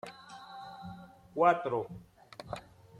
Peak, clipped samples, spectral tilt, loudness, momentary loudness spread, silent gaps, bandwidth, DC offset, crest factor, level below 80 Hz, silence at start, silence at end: -12 dBFS; under 0.1%; -6.5 dB/octave; -31 LUFS; 24 LU; none; 12 kHz; under 0.1%; 22 dB; -66 dBFS; 0.05 s; 0 s